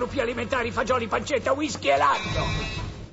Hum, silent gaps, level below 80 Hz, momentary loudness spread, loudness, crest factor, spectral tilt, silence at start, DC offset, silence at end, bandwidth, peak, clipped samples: none; none; -40 dBFS; 7 LU; -25 LUFS; 16 dB; -4.5 dB/octave; 0 s; under 0.1%; 0 s; 8 kHz; -10 dBFS; under 0.1%